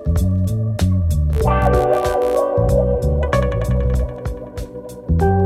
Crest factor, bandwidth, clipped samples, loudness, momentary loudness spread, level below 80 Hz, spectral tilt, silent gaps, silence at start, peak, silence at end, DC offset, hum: 14 dB; 15 kHz; under 0.1%; -18 LUFS; 12 LU; -22 dBFS; -8 dB/octave; none; 0 s; -2 dBFS; 0 s; under 0.1%; none